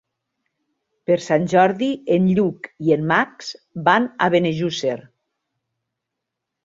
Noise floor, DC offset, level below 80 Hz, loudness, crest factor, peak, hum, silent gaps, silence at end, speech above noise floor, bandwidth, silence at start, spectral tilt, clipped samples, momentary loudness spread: -81 dBFS; under 0.1%; -62 dBFS; -19 LUFS; 20 dB; -2 dBFS; none; none; 1.65 s; 63 dB; 7.8 kHz; 1.1 s; -6 dB/octave; under 0.1%; 10 LU